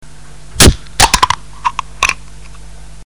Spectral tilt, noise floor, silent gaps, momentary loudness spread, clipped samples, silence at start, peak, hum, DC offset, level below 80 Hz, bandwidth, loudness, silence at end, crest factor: -2.5 dB/octave; -36 dBFS; none; 12 LU; 1%; 0.55 s; 0 dBFS; none; 3%; -22 dBFS; over 20 kHz; -11 LUFS; 0.05 s; 14 dB